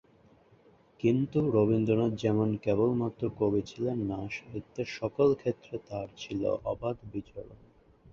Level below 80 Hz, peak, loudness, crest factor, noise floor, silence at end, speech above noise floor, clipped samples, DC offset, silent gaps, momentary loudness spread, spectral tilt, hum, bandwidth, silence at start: -58 dBFS; -12 dBFS; -30 LUFS; 18 dB; -61 dBFS; 0.6 s; 32 dB; under 0.1%; under 0.1%; none; 13 LU; -8 dB/octave; none; 7.2 kHz; 1.05 s